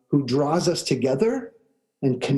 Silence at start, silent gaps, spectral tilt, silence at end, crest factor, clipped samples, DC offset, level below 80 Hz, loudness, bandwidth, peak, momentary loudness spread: 0.1 s; none; -6 dB/octave; 0 s; 16 dB; under 0.1%; under 0.1%; -62 dBFS; -23 LUFS; 12.5 kHz; -8 dBFS; 7 LU